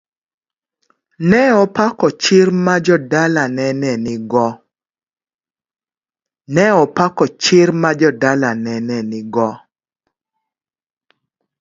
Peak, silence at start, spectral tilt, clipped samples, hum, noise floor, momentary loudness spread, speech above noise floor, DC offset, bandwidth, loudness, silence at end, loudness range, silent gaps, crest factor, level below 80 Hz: 0 dBFS; 1.2 s; -5.5 dB/octave; under 0.1%; none; under -90 dBFS; 9 LU; over 76 dB; under 0.1%; 7.8 kHz; -14 LUFS; 2.05 s; 7 LU; 5.03-5.07 s, 5.34-5.39 s; 16 dB; -58 dBFS